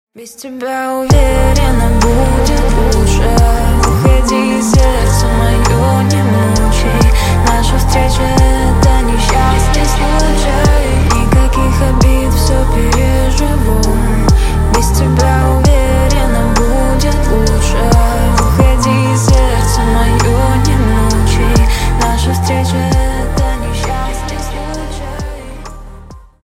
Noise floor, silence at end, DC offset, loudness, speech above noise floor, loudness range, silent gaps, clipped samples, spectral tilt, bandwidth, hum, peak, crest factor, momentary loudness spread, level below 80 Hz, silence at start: -33 dBFS; 0.25 s; under 0.1%; -12 LUFS; 24 dB; 2 LU; none; under 0.1%; -5.5 dB/octave; 16 kHz; none; 0 dBFS; 10 dB; 7 LU; -12 dBFS; 0.15 s